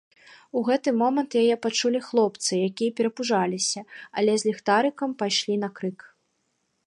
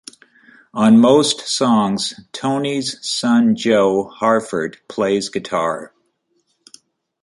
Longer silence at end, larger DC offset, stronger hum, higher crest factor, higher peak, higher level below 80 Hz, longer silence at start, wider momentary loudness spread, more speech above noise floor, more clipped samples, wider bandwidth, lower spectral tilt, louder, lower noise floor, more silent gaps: second, 0.8 s vs 1.35 s; neither; neither; about the same, 18 dB vs 16 dB; second, -8 dBFS vs -2 dBFS; second, -78 dBFS vs -60 dBFS; second, 0.55 s vs 0.75 s; second, 7 LU vs 12 LU; about the same, 49 dB vs 50 dB; neither; about the same, 11.5 kHz vs 11.5 kHz; about the same, -3.5 dB/octave vs -4.5 dB/octave; second, -25 LUFS vs -17 LUFS; first, -74 dBFS vs -66 dBFS; neither